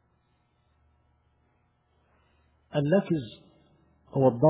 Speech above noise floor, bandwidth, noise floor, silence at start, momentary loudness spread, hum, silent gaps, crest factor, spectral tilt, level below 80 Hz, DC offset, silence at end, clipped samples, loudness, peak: 46 dB; 4 kHz; -70 dBFS; 2.75 s; 17 LU; none; none; 20 dB; -7.5 dB/octave; -66 dBFS; under 0.1%; 0 s; under 0.1%; -27 LUFS; -10 dBFS